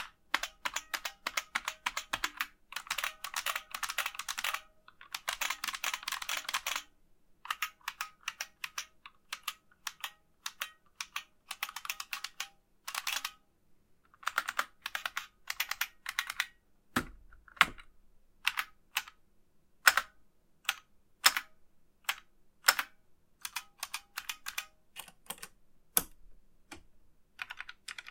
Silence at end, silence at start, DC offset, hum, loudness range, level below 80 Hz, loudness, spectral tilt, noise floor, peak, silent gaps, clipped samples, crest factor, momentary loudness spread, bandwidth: 0 s; 0 s; under 0.1%; none; 9 LU; -66 dBFS; -36 LUFS; 0.5 dB/octave; -66 dBFS; -2 dBFS; none; under 0.1%; 36 dB; 16 LU; 17 kHz